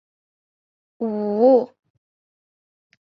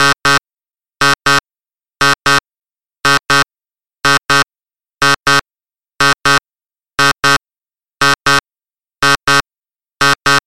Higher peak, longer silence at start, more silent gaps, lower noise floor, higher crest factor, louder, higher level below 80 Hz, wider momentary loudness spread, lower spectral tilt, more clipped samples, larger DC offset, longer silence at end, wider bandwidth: second, -6 dBFS vs 0 dBFS; first, 1 s vs 0 s; neither; about the same, under -90 dBFS vs under -90 dBFS; about the same, 18 dB vs 14 dB; second, -19 LUFS vs -12 LUFS; second, -74 dBFS vs -44 dBFS; first, 14 LU vs 5 LU; first, -10 dB/octave vs -2 dB/octave; neither; neither; first, 1.4 s vs 0.1 s; second, 5.2 kHz vs 17 kHz